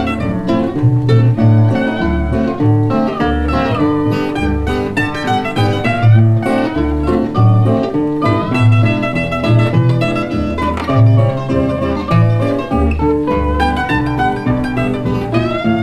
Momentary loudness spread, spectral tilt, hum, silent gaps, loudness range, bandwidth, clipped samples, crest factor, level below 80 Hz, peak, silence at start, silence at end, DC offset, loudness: 6 LU; -8.5 dB/octave; none; none; 2 LU; 9.2 kHz; under 0.1%; 12 dB; -26 dBFS; 0 dBFS; 0 s; 0 s; under 0.1%; -14 LUFS